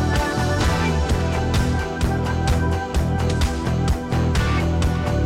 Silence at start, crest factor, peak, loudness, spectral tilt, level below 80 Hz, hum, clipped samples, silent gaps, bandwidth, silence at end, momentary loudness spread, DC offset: 0 s; 14 dB; -6 dBFS; -21 LUFS; -6 dB/octave; -26 dBFS; none; under 0.1%; none; 15.5 kHz; 0 s; 2 LU; under 0.1%